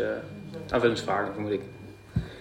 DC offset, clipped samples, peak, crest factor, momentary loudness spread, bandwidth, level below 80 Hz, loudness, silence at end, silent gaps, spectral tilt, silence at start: under 0.1%; under 0.1%; -8 dBFS; 22 dB; 15 LU; 16 kHz; -48 dBFS; -29 LUFS; 0 s; none; -6 dB/octave; 0 s